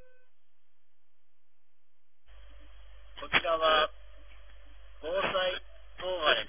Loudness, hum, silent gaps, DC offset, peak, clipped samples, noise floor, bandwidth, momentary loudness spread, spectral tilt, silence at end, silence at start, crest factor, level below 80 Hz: -29 LUFS; none; none; 0.5%; -10 dBFS; under 0.1%; -83 dBFS; 3.7 kHz; 17 LU; 0.5 dB/octave; 0 s; 2.35 s; 24 dB; -56 dBFS